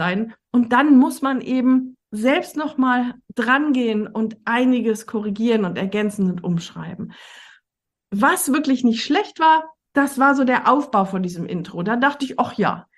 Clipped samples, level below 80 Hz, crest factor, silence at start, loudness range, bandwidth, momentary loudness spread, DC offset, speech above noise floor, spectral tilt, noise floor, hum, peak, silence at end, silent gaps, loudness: under 0.1%; -64 dBFS; 16 dB; 0 s; 5 LU; 12.5 kHz; 10 LU; under 0.1%; 64 dB; -5 dB/octave; -83 dBFS; none; -2 dBFS; 0.15 s; none; -19 LUFS